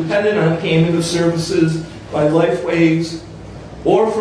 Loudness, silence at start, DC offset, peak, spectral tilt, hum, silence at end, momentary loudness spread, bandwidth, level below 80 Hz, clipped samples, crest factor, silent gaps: -16 LUFS; 0 s; under 0.1%; -2 dBFS; -6 dB/octave; none; 0 s; 12 LU; 11 kHz; -44 dBFS; under 0.1%; 14 dB; none